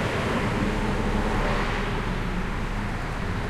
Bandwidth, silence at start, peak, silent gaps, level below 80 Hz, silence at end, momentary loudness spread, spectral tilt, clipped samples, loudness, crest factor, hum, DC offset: 13 kHz; 0 s; -12 dBFS; none; -30 dBFS; 0 s; 5 LU; -6 dB/octave; under 0.1%; -27 LUFS; 14 dB; none; under 0.1%